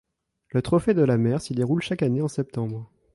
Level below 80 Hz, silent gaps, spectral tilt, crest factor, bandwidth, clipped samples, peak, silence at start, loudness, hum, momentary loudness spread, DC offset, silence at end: -54 dBFS; none; -7.5 dB/octave; 14 dB; 11.5 kHz; under 0.1%; -10 dBFS; 0.55 s; -24 LUFS; none; 10 LU; under 0.1%; 0.3 s